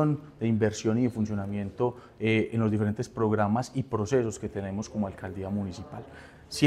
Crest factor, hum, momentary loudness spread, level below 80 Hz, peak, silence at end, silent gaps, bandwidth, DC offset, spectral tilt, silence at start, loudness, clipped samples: 18 dB; none; 11 LU; -58 dBFS; -10 dBFS; 0 s; none; 13 kHz; under 0.1%; -6.5 dB/octave; 0 s; -29 LUFS; under 0.1%